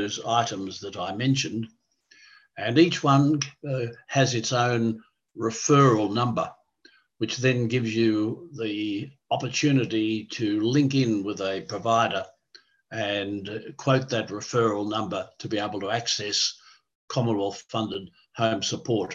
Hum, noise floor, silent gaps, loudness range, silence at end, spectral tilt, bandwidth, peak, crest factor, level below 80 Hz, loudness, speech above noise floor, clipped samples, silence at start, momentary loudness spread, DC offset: none; -59 dBFS; 16.95-17.08 s; 4 LU; 0 s; -5 dB/octave; 8 kHz; -6 dBFS; 20 dB; -64 dBFS; -25 LUFS; 34 dB; under 0.1%; 0 s; 12 LU; under 0.1%